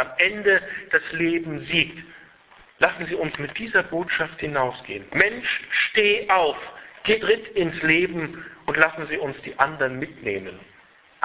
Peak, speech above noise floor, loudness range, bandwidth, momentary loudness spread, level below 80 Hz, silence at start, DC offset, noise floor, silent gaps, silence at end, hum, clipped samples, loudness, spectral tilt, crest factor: 0 dBFS; 30 dB; 3 LU; 4 kHz; 11 LU; -56 dBFS; 0 s; under 0.1%; -54 dBFS; none; 0.6 s; none; under 0.1%; -22 LUFS; -8 dB/octave; 24 dB